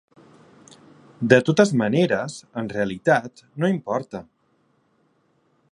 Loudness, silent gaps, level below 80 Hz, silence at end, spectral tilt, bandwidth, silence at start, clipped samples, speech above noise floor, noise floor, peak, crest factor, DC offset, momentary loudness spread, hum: -21 LUFS; none; -62 dBFS; 1.5 s; -6 dB/octave; 11 kHz; 1.2 s; under 0.1%; 44 dB; -65 dBFS; 0 dBFS; 24 dB; under 0.1%; 14 LU; none